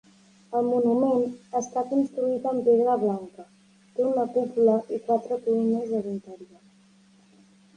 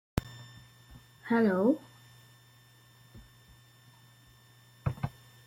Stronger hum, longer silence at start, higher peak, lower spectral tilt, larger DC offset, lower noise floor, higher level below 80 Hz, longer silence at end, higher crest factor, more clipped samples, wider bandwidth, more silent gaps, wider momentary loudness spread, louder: neither; first, 0.5 s vs 0.15 s; about the same, -10 dBFS vs -12 dBFS; about the same, -7.5 dB/octave vs -7.5 dB/octave; neither; about the same, -58 dBFS vs -59 dBFS; second, -74 dBFS vs -54 dBFS; first, 1.35 s vs 0.4 s; second, 16 dB vs 24 dB; neither; second, 9.6 kHz vs 16.5 kHz; neither; second, 10 LU vs 29 LU; first, -25 LUFS vs -31 LUFS